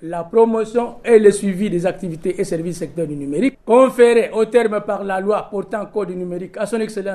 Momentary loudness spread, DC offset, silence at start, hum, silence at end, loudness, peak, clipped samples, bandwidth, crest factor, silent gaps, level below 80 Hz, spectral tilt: 13 LU; under 0.1%; 0 s; none; 0 s; -18 LUFS; 0 dBFS; under 0.1%; 13 kHz; 18 dB; none; -50 dBFS; -6 dB/octave